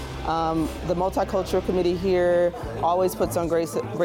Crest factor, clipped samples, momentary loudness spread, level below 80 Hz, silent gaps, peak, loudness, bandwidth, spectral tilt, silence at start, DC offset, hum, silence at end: 12 dB; under 0.1%; 6 LU; -40 dBFS; none; -12 dBFS; -24 LUFS; 17 kHz; -6 dB/octave; 0 s; under 0.1%; none; 0 s